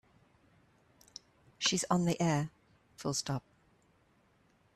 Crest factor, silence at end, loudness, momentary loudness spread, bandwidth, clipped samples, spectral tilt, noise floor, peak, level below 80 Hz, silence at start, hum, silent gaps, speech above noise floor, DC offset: 22 dB; 1.35 s; -33 LUFS; 22 LU; 13.5 kHz; under 0.1%; -4 dB/octave; -69 dBFS; -16 dBFS; -70 dBFS; 1.6 s; none; none; 37 dB; under 0.1%